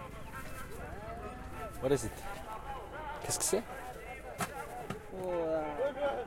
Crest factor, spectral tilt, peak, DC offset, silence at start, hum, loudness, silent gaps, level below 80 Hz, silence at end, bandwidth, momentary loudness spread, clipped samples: 20 dB; -4 dB/octave; -18 dBFS; under 0.1%; 0 s; none; -38 LUFS; none; -52 dBFS; 0 s; 16.5 kHz; 12 LU; under 0.1%